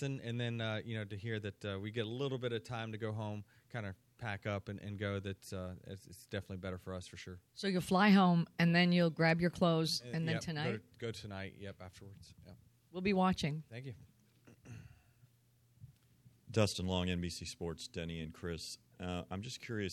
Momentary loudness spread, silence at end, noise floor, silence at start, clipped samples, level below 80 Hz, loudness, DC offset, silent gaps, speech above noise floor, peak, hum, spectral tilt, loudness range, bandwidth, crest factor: 19 LU; 0 s; -71 dBFS; 0 s; under 0.1%; -64 dBFS; -37 LUFS; under 0.1%; none; 34 dB; -16 dBFS; none; -6 dB/octave; 12 LU; 13.5 kHz; 20 dB